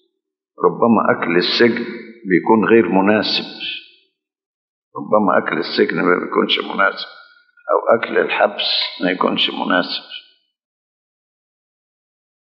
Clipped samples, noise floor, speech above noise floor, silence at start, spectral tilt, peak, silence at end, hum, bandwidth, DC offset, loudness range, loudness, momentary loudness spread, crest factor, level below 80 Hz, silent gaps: under 0.1%; -76 dBFS; 60 dB; 0.6 s; -6.5 dB/octave; 0 dBFS; 2.35 s; none; 6.2 kHz; under 0.1%; 5 LU; -16 LUFS; 15 LU; 18 dB; -72 dBFS; 4.46-4.91 s